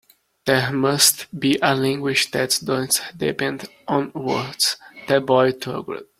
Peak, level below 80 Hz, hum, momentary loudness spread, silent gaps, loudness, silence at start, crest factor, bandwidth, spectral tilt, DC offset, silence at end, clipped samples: 0 dBFS; -60 dBFS; none; 11 LU; none; -20 LUFS; 0.45 s; 20 dB; 16.5 kHz; -3 dB/octave; under 0.1%; 0.15 s; under 0.1%